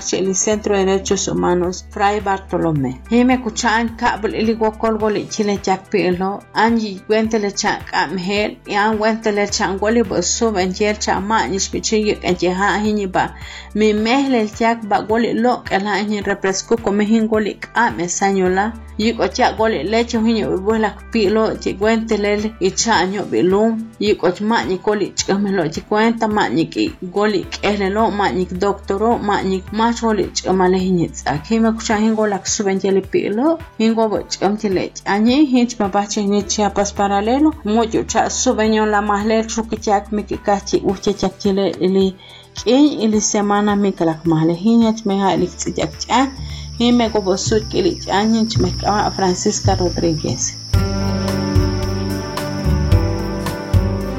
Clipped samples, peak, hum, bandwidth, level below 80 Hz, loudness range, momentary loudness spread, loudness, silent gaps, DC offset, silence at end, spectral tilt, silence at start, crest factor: under 0.1%; -2 dBFS; none; 15 kHz; -34 dBFS; 2 LU; 5 LU; -17 LUFS; none; under 0.1%; 0 s; -4.5 dB/octave; 0 s; 16 dB